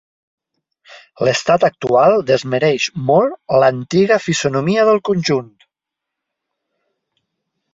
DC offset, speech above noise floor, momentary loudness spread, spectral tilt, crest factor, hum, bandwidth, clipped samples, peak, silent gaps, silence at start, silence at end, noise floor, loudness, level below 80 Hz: under 0.1%; 68 dB; 5 LU; -5 dB/octave; 16 dB; none; 7.8 kHz; under 0.1%; -2 dBFS; none; 0.9 s; 2.3 s; -82 dBFS; -15 LUFS; -56 dBFS